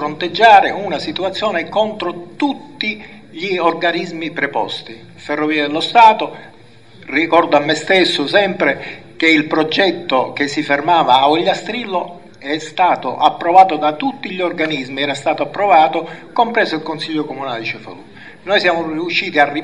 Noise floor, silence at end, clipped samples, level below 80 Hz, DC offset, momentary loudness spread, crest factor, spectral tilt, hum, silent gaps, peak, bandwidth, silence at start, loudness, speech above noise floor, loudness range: -43 dBFS; 0 s; under 0.1%; -60 dBFS; 0.5%; 13 LU; 16 dB; -4.5 dB/octave; none; none; 0 dBFS; 10.5 kHz; 0 s; -15 LUFS; 28 dB; 5 LU